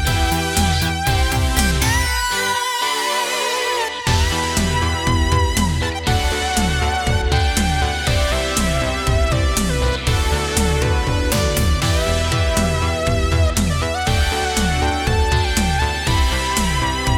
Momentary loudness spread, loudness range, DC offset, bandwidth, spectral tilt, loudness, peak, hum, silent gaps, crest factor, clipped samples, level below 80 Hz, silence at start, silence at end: 2 LU; 0 LU; under 0.1%; 18.5 kHz; -4 dB/octave; -18 LUFS; -2 dBFS; none; none; 14 dB; under 0.1%; -24 dBFS; 0 s; 0 s